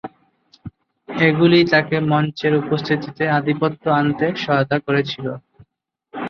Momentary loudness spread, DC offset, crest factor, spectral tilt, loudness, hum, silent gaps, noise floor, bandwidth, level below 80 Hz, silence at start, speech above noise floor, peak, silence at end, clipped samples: 14 LU; under 0.1%; 18 dB; -7.5 dB/octave; -18 LUFS; none; none; -67 dBFS; 6.6 kHz; -56 dBFS; 0.05 s; 49 dB; -2 dBFS; 0 s; under 0.1%